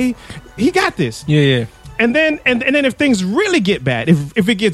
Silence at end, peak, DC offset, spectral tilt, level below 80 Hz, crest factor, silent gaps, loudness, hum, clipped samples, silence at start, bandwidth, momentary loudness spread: 0 s; 0 dBFS; under 0.1%; -5.5 dB/octave; -44 dBFS; 14 dB; none; -15 LUFS; none; under 0.1%; 0 s; 13.5 kHz; 7 LU